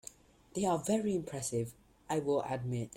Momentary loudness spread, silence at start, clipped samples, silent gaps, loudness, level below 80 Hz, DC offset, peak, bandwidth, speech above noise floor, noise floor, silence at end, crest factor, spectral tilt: 10 LU; 0.05 s; under 0.1%; none; -35 LUFS; -66 dBFS; under 0.1%; -20 dBFS; 16.5 kHz; 22 dB; -56 dBFS; 0.1 s; 16 dB; -5.5 dB/octave